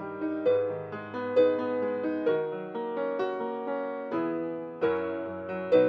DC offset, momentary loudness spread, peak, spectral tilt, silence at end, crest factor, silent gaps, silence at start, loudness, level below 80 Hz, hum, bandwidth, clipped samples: under 0.1%; 10 LU; -10 dBFS; -8.5 dB/octave; 0 s; 18 dB; none; 0 s; -30 LUFS; -78 dBFS; none; 5 kHz; under 0.1%